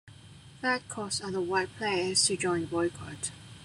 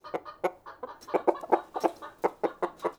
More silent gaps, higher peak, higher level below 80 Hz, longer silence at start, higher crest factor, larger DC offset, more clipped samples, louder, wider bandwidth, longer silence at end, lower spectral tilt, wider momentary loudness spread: neither; second, -12 dBFS vs -6 dBFS; first, -64 dBFS vs -70 dBFS; about the same, 0.05 s vs 0.05 s; second, 18 dB vs 24 dB; neither; neither; about the same, -30 LUFS vs -31 LUFS; second, 13 kHz vs over 20 kHz; about the same, 0 s vs 0.05 s; second, -2.5 dB/octave vs -5.5 dB/octave; about the same, 12 LU vs 13 LU